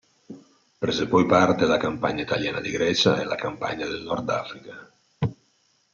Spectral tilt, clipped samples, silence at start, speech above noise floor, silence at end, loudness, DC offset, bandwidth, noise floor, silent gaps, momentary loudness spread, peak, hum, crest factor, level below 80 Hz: -5 dB/octave; under 0.1%; 0.3 s; 42 dB; 0.6 s; -24 LUFS; under 0.1%; 7.6 kHz; -66 dBFS; none; 11 LU; -6 dBFS; none; 20 dB; -58 dBFS